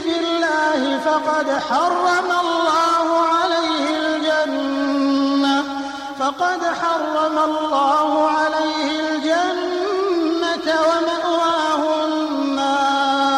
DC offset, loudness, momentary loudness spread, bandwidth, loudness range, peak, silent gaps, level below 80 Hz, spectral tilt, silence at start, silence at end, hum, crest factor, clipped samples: under 0.1%; -18 LUFS; 4 LU; 13 kHz; 2 LU; -6 dBFS; none; -60 dBFS; -2.5 dB/octave; 0 s; 0 s; none; 12 dB; under 0.1%